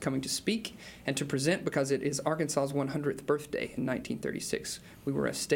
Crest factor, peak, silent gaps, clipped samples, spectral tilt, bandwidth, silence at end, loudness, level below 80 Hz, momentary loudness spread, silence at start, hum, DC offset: 18 dB; -14 dBFS; none; under 0.1%; -4.5 dB/octave; 17 kHz; 0 s; -32 LUFS; -62 dBFS; 6 LU; 0 s; none; under 0.1%